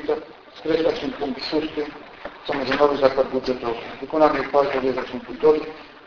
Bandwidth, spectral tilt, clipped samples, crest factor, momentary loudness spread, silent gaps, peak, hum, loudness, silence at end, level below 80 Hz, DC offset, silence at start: 5.4 kHz; -6 dB/octave; under 0.1%; 20 dB; 14 LU; none; -2 dBFS; none; -22 LUFS; 0.05 s; -52 dBFS; under 0.1%; 0 s